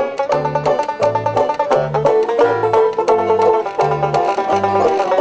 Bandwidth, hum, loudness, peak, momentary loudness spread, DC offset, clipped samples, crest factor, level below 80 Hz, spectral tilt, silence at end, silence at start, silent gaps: 8 kHz; none; -16 LUFS; -2 dBFS; 3 LU; under 0.1%; under 0.1%; 14 dB; -50 dBFS; -6 dB/octave; 0 s; 0 s; none